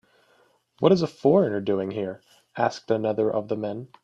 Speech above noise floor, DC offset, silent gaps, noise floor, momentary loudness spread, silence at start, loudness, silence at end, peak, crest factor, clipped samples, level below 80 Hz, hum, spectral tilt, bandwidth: 39 dB; under 0.1%; none; -63 dBFS; 12 LU; 0.8 s; -24 LUFS; 0.15 s; -4 dBFS; 20 dB; under 0.1%; -66 dBFS; none; -7.5 dB/octave; 8 kHz